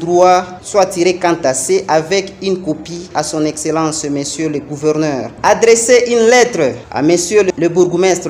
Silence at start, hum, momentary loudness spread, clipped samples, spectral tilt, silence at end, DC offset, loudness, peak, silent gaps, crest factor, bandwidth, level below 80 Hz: 0 s; none; 9 LU; under 0.1%; -4 dB/octave; 0 s; under 0.1%; -13 LUFS; 0 dBFS; none; 12 dB; 16 kHz; -48 dBFS